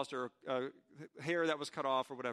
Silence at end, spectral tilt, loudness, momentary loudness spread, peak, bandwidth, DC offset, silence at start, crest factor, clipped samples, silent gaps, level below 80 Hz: 0 s; -4.5 dB/octave; -38 LUFS; 12 LU; -22 dBFS; 13 kHz; under 0.1%; 0 s; 18 dB; under 0.1%; none; -86 dBFS